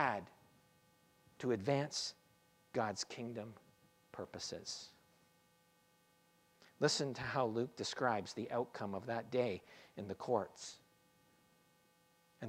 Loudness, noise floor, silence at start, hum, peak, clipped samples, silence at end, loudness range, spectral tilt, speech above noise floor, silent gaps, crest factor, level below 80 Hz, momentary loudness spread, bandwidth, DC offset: -41 LUFS; -73 dBFS; 0 s; none; -18 dBFS; under 0.1%; 0 s; 8 LU; -4 dB/octave; 33 dB; none; 24 dB; -80 dBFS; 15 LU; 16 kHz; under 0.1%